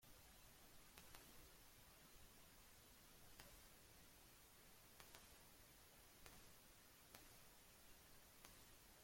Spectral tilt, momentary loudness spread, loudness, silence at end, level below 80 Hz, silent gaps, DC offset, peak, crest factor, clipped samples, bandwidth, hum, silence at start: -2.5 dB/octave; 3 LU; -66 LUFS; 0 s; -76 dBFS; none; under 0.1%; -36 dBFS; 30 dB; under 0.1%; 16.5 kHz; none; 0 s